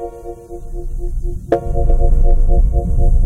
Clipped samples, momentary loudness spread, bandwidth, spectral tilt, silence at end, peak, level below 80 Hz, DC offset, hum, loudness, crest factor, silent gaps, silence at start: under 0.1%; 15 LU; 2 kHz; -9.5 dB/octave; 0 s; -2 dBFS; -14 dBFS; under 0.1%; none; -19 LUFS; 12 dB; none; 0 s